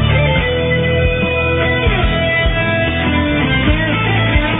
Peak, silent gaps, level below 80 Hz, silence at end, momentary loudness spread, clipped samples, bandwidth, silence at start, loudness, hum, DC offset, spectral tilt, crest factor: 0 dBFS; none; -22 dBFS; 0 s; 1 LU; under 0.1%; 4 kHz; 0 s; -14 LUFS; none; under 0.1%; -9.5 dB/octave; 14 dB